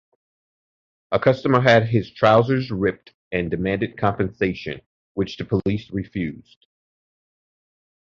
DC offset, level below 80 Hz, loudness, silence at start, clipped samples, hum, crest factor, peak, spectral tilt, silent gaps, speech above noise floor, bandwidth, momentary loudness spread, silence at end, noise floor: under 0.1%; -48 dBFS; -21 LUFS; 1.1 s; under 0.1%; none; 20 dB; -2 dBFS; -7.5 dB/octave; 3.14-3.31 s, 4.86-5.15 s; over 69 dB; 7.2 kHz; 14 LU; 1.7 s; under -90 dBFS